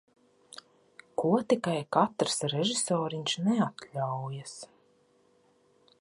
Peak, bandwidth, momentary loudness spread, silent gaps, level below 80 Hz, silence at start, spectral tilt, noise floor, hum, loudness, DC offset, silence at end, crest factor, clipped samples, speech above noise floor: -8 dBFS; 11.5 kHz; 22 LU; none; -76 dBFS; 0.55 s; -4.5 dB/octave; -66 dBFS; none; -30 LUFS; under 0.1%; 1.35 s; 24 dB; under 0.1%; 37 dB